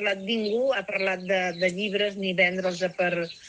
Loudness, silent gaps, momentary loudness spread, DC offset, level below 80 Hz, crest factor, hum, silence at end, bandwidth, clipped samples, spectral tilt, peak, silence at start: -25 LUFS; none; 4 LU; under 0.1%; -70 dBFS; 16 dB; none; 0 s; 9.4 kHz; under 0.1%; -4.5 dB/octave; -10 dBFS; 0 s